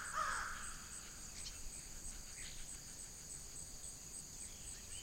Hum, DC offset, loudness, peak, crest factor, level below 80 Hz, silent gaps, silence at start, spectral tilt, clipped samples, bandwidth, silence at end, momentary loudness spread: none; under 0.1%; -47 LUFS; -28 dBFS; 20 dB; -56 dBFS; none; 0 s; -1 dB/octave; under 0.1%; 16 kHz; 0 s; 8 LU